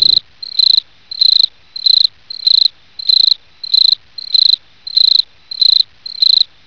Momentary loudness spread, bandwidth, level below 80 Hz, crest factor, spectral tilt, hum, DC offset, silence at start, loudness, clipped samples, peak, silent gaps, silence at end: 8 LU; 5.4 kHz; -62 dBFS; 12 dB; 1 dB/octave; none; 0.5%; 0 s; -10 LUFS; under 0.1%; 0 dBFS; none; 0.2 s